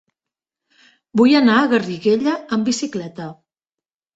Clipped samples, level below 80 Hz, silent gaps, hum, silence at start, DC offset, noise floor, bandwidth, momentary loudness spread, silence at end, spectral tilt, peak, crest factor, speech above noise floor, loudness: under 0.1%; -64 dBFS; none; none; 1.15 s; under 0.1%; -89 dBFS; 8 kHz; 17 LU; 0.8 s; -5 dB/octave; -2 dBFS; 16 dB; 72 dB; -17 LUFS